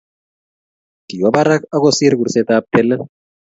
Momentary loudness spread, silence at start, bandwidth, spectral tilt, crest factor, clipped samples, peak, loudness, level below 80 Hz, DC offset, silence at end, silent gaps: 9 LU; 1.1 s; 8 kHz; -5 dB/octave; 16 dB; under 0.1%; 0 dBFS; -14 LUFS; -56 dBFS; under 0.1%; 0.4 s; none